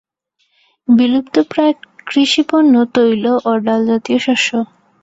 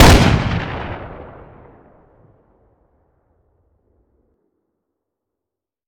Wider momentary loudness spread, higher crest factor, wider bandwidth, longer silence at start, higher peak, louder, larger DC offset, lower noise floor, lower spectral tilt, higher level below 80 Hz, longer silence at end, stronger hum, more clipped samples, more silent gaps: second, 8 LU vs 27 LU; second, 12 dB vs 20 dB; second, 8 kHz vs 17 kHz; first, 0.9 s vs 0 s; about the same, -2 dBFS vs 0 dBFS; about the same, -14 LUFS vs -16 LUFS; neither; second, -65 dBFS vs -85 dBFS; about the same, -4.5 dB/octave vs -5 dB/octave; second, -60 dBFS vs -26 dBFS; second, 0.4 s vs 4.6 s; neither; neither; neither